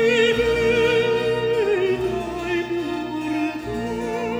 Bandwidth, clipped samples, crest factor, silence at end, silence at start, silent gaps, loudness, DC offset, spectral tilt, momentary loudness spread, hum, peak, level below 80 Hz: over 20 kHz; under 0.1%; 14 dB; 0 s; 0 s; none; -21 LUFS; under 0.1%; -5 dB/octave; 9 LU; none; -6 dBFS; -44 dBFS